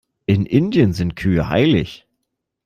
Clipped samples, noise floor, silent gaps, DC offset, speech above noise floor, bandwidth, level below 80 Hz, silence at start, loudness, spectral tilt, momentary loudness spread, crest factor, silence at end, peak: under 0.1%; -76 dBFS; none; under 0.1%; 60 dB; 14 kHz; -42 dBFS; 0.3 s; -17 LUFS; -8 dB/octave; 5 LU; 16 dB; 0.7 s; -2 dBFS